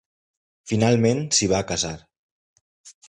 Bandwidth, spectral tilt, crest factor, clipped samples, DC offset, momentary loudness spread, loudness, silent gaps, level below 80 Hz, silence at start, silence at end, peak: 11 kHz; -4 dB/octave; 18 dB; under 0.1%; under 0.1%; 9 LU; -21 LUFS; 2.18-2.84 s; -50 dBFS; 0.65 s; 0.15 s; -6 dBFS